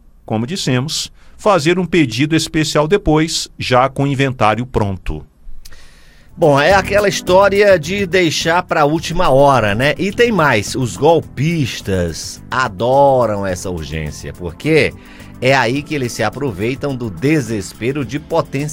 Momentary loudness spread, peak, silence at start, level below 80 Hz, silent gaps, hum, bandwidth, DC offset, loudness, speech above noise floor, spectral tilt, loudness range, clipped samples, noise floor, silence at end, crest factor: 11 LU; 0 dBFS; 0.3 s; -34 dBFS; none; none; 16.5 kHz; under 0.1%; -15 LUFS; 26 dB; -5 dB/octave; 5 LU; under 0.1%; -41 dBFS; 0 s; 16 dB